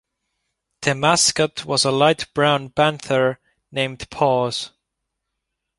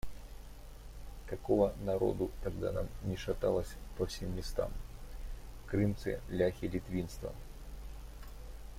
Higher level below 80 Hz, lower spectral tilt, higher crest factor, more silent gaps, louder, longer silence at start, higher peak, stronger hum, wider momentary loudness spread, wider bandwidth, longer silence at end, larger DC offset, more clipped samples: second, -54 dBFS vs -46 dBFS; second, -3 dB/octave vs -7 dB/octave; about the same, 20 dB vs 20 dB; neither; first, -19 LUFS vs -36 LUFS; first, 0.8 s vs 0.05 s; first, -2 dBFS vs -16 dBFS; neither; second, 10 LU vs 18 LU; second, 11.5 kHz vs 16.5 kHz; first, 1.1 s vs 0 s; neither; neither